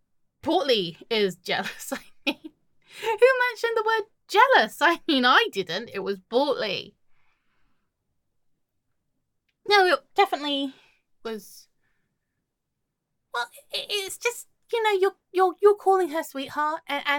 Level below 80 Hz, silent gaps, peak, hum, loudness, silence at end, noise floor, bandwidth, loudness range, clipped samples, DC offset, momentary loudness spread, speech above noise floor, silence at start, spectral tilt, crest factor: -72 dBFS; none; -4 dBFS; none; -24 LUFS; 0 s; -80 dBFS; 17.5 kHz; 12 LU; under 0.1%; under 0.1%; 15 LU; 57 dB; 0.45 s; -3 dB/octave; 22 dB